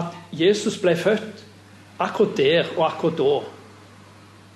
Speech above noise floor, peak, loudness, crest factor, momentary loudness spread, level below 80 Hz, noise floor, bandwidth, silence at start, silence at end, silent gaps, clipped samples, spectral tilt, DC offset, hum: 27 dB; -6 dBFS; -21 LUFS; 16 dB; 9 LU; -68 dBFS; -47 dBFS; 12 kHz; 0 s; 0.9 s; none; under 0.1%; -5 dB/octave; under 0.1%; none